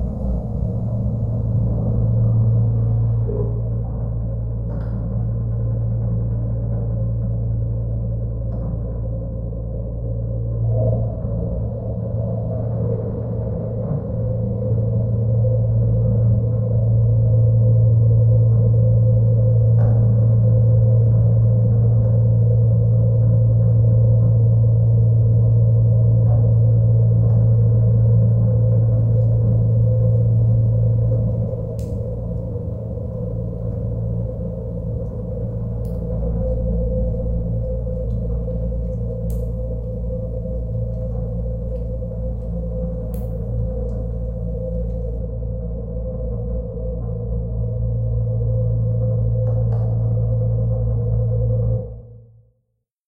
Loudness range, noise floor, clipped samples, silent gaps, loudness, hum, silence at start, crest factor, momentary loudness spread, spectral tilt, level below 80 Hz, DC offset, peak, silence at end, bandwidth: 10 LU; -71 dBFS; under 0.1%; none; -19 LUFS; none; 0 s; 12 dB; 11 LU; -13.5 dB/octave; -28 dBFS; under 0.1%; -6 dBFS; 0.9 s; 1.3 kHz